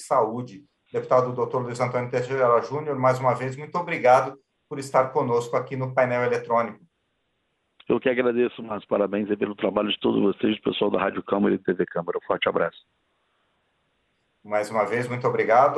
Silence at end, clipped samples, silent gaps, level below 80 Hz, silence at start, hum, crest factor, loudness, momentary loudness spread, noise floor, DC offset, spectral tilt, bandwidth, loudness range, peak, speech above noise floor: 0 s; under 0.1%; none; -66 dBFS; 0 s; none; 18 dB; -24 LUFS; 8 LU; -73 dBFS; under 0.1%; -6 dB/octave; 12 kHz; 5 LU; -6 dBFS; 50 dB